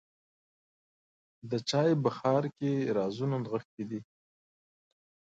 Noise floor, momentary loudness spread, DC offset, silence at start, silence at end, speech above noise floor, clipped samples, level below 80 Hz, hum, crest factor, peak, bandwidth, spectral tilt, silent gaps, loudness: under -90 dBFS; 12 LU; under 0.1%; 1.45 s; 1.35 s; over 59 dB; under 0.1%; -76 dBFS; none; 20 dB; -14 dBFS; 9.2 kHz; -6.5 dB/octave; 3.65-3.78 s; -31 LUFS